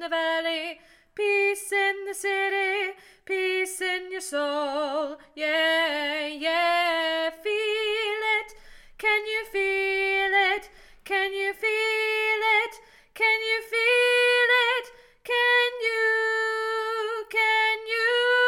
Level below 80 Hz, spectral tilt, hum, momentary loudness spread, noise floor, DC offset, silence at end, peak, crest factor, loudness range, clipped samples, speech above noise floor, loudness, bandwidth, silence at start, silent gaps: -62 dBFS; 0 dB/octave; none; 9 LU; -48 dBFS; under 0.1%; 0 s; -12 dBFS; 14 dB; 5 LU; under 0.1%; 21 dB; -24 LUFS; 17 kHz; 0 s; none